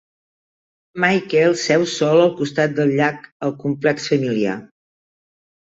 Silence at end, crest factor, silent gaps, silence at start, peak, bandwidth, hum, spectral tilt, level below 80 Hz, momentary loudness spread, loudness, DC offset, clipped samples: 1.1 s; 18 dB; 3.32-3.40 s; 0.95 s; -2 dBFS; 8 kHz; none; -5.5 dB/octave; -62 dBFS; 9 LU; -18 LUFS; under 0.1%; under 0.1%